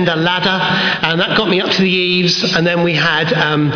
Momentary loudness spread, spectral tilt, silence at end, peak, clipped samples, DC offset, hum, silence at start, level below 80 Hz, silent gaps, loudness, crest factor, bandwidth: 2 LU; -5 dB/octave; 0 s; -2 dBFS; under 0.1%; under 0.1%; none; 0 s; -48 dBFS; none; -13 LUFS; 12 dB; 5.4 kHz